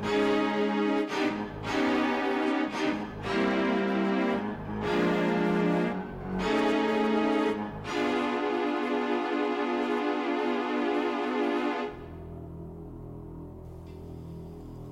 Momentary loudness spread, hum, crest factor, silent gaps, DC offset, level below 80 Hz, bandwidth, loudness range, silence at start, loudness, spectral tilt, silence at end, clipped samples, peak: 17 LU; none; 10 dB; none; under 0.1%; -54 dBFS; 12 kHz; 5 LU; 0 s; -28 LUFS; -6 dB/octave; 0 s; under 0.1%; -18 dBFS